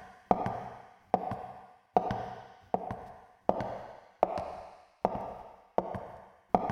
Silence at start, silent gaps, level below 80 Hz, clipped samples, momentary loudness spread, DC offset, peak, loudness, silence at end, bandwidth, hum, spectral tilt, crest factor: 0 s; none; -58 dBFS; under 0.1%; 17 LU; under 0.1%; -8 dBFS; -35 LUFS; 0 s; 10 kHz; none; -8 dB/octave; 28 dB